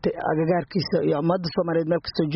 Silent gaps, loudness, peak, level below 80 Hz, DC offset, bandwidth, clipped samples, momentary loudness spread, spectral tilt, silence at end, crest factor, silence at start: none; -24 LUFS; -10 dBFS; -54 dBFS; under 0.1%; 6 kHz; under 0.1%; 2 LU; -5.5 dB/octave; 0 s; 14 dB; 0.05 s